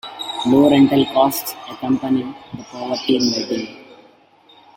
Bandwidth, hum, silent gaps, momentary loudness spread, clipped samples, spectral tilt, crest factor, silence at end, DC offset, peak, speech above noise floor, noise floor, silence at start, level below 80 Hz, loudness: 16.5 kHz; none; none; 17 LU; under 0.1%; -5 dB/octave; 18 dB; 0.85 s; under 0.1%; -2 dBFS; 33 dB; -51 dBFS; 0.05 s; -58 dBFS; -17 LUFS